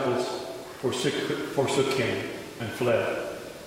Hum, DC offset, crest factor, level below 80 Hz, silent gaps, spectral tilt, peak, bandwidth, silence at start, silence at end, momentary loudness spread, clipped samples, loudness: none; under 0.1%; 18 dB; -62 dBFS; none; -4.5 dB/octave; -10 dBFS; 16 kHz; 0 s; 0 s; 10 LU; under 0.1%; -28 LUFS